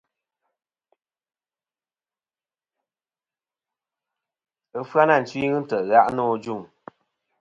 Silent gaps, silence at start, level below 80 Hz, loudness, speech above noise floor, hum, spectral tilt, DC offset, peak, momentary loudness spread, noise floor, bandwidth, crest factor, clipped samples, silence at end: none; 4.75 s; -68 dBFS; -21 LUFS; over 69 dB; none; -6.5 dB/octave; under 0.1%; -4 dBFS; 16 LU; under -90 dBFS; 7.8 kHz; 24 dB; under 0.1%; 0.75 s